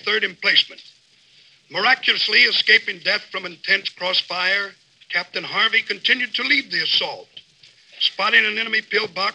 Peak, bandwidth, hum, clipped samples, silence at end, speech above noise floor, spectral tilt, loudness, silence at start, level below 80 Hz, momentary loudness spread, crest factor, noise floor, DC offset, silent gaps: -2 dBFS; 9.8 kHz; none; under 0.1%; 0 s; 34 dB; -2 dB/octave; -18 LUFS; 0.05 s; -80 dBFS; 10 LU; 20 dB; -54 dBFS; under 0.1%; none